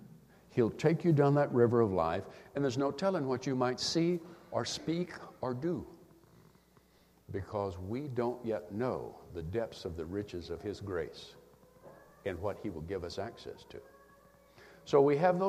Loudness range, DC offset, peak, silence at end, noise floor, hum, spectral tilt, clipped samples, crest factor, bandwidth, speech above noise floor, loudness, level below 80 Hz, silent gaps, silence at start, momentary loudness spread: 11 LU; under 0.1%; -12 dBFS; 0 s; -65 dBFS; none; -6.5 dB/octave; under 0.1%; 22 dB; 14.5 kHz; 33 dB; -34 LUFS; -62 dBFS; none; 0 s; 16 LU